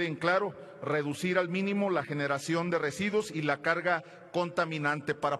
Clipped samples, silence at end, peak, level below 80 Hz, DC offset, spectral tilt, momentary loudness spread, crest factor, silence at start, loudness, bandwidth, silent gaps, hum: under 0.1%; 0 s; -12 dBFS; -72 dBFS; under 0.1%; -5.5 dB/octave; 5 LU; 18 dB; 0 s; -31 LUFS; 12.5 kHz; none; none